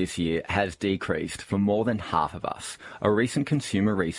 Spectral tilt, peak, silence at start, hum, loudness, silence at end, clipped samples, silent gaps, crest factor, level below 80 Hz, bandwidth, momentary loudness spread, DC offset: -5.5 dB/octave; -8 dBFS; 0 s; none; -27 LUFS; 0 s; under 0.1%; none; 18 dB; -54 dBFS; 11.5 kHz; 7 LU; under 0.1%